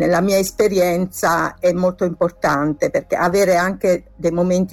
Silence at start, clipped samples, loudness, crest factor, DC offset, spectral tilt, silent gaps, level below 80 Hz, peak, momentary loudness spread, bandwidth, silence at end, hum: 0 s; under 0.1%; -18 LUFS; 12 dB; under 0.1%; -5.5 dB/octave; none; -46 dBFS; -6 dBFS; 4 LU; 17.5 kHz; 0 s; none